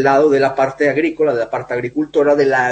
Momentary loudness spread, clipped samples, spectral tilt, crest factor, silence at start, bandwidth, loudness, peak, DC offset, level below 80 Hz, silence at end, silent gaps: 8 LU; under 0.1%; -6 dB/octave; 12 dB; 0 s; 8.6 kHz; -15 LUFS; -2 dBFS; under 0.1%; -54 dBFS; 0 s; none